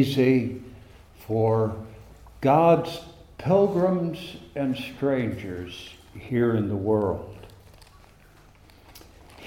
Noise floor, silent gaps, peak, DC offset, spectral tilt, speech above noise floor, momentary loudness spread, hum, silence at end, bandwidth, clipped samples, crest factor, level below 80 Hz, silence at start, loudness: -53 dBFS; none; -6 dBFS; under 0.1%; -8 dB/octave; 30 dB; 21 LU; none; 0 s; 16.5 kHz; under 0.1%; 18 dB; -54 dBFS; 0 s; -24 LUFS